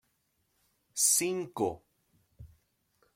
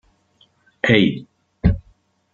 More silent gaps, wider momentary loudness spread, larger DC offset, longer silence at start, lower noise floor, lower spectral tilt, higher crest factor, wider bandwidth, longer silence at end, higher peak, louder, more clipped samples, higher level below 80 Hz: neither; first, 16 LU vs 13 LU; neither; about the same, 0.95 s vs 0.85 s; first, -76 dBFS vs -59 dBFS; second, -2 dB/octave vs -7 dB/octave; about the same, 24 dB vs 20 dB; first, 16.5 kHz vs 7.2 kHz; first, 0.7 s vs 0.55 s; second, -12 dBFS vs -2 dBFS; second, -28 LUFS vs -19 LUFS; neither; second, -68 dBFS vs -34 dBFS